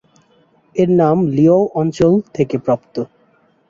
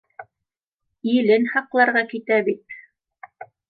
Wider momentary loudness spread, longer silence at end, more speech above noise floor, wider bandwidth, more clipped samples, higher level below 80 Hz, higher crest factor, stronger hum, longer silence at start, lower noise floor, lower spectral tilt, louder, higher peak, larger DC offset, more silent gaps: about the same, 13 LU vs 14 LU; first, 0.65 s vs 0.25 s; second, 41 dB vs 65 dB; first, 7.6 kHz vs 4.8 kHz; neither; first, -50 dBFS vs -76 dBFS; about the same, 14 dB vs 18 dB; neither; first, 0.75 s vs 0.2 s; second, -56 dBFS vs -84 dBFS; about the same, -9 dB/octave vs -8.5 dB/octave; first, -15 LUFS vs -20 LUFS; about the same, -2 dBFS vs -4 dBFS; neither; second, none vs 0.67-0.72 s